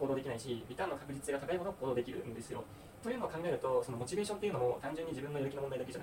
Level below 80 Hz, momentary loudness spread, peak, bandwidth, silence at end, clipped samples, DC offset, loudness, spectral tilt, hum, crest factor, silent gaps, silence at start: -64 dBFS; 9 LU; -24 dBFS; 16.5 kHz; 0 s; under 0.1%; under 0.1%; -39 LUFS; -5.5 dB/octave; none; 16 dB; none; 0 s